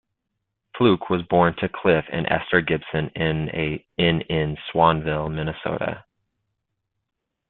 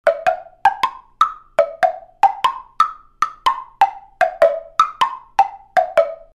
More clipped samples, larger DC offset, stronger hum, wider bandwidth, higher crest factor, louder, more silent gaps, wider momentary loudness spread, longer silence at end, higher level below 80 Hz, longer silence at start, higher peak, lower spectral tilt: neither; neither; neither; second, 4.3 kHz vs 14.5 kHz; about the same, 22 dB vs 18 dB; second, -22 LUFS vs -19 LUFS; neither; first, 8 LU vs 5 LU; first, 1.5 s vs 0.2 s; first, -48 dBFS vs -54 dBFS; first, 0.75 s vs 0.05 s; about the same, -2 dBFS vs -2 dBFS; first, -11 dB/octave vs -1.5 dB/octave